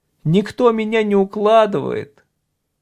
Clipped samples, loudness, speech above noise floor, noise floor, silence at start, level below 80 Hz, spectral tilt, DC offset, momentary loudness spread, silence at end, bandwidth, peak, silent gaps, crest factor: under 0.1%; -16 LUFS; 56 dB; -72 dBFS; 0.25 s; -58 dBFS; -7.5 dB/octave; under 0.1%; 9 LU; 0.75 s; 11 kHz; -2 dBFS; none; 16 dB